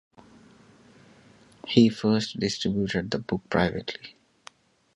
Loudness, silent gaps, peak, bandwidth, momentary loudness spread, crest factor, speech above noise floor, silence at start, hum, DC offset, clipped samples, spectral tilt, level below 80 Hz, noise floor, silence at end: -25 LUFS; none; -4 dBFS; 11 kHz; 17 LU; 24 dB; 30 dB; 1.65 s; none; under 0.1%; under 0.1%; -5.5 dB/octave; -54 dBFS; -55 dBFS; 0.85 s